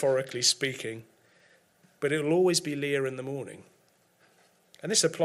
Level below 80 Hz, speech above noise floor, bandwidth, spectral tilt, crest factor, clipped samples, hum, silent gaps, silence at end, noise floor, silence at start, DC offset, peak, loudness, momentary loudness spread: -76 dBFS; 38 dB; 15.5 kHz; -3 dB/octave; 20 dB; under 0.1%; none; none; 0 s; -66 dBFS; 0 s; under 0.1%; -10 dBFS; -28 LUFS; 14 LU